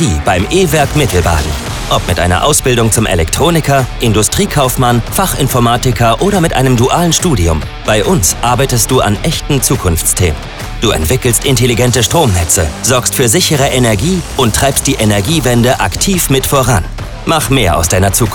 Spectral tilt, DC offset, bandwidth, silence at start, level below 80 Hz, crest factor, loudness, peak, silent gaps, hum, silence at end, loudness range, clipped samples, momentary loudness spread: -4 dB/octave; 0.2%; over 20 kHz; 0 s; -22 dBFS; 10 dB; -10 LUFS; 0 dBFS; none; none; 0 s; 1 LU; under 0.1%; 4 LU